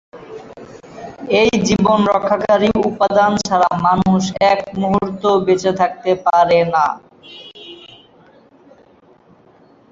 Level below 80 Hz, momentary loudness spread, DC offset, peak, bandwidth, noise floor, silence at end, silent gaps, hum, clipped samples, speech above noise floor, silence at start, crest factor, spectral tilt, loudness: -46 dBFS; 21 LU; under 0.1%; -2 dBFS; 7.8 kHz; -49 dBFS; 2.05 s; none; none; under 0.1%; 34 dB; 0.15 s; 16 dB; -5.5 dB/octave; -15 LUFS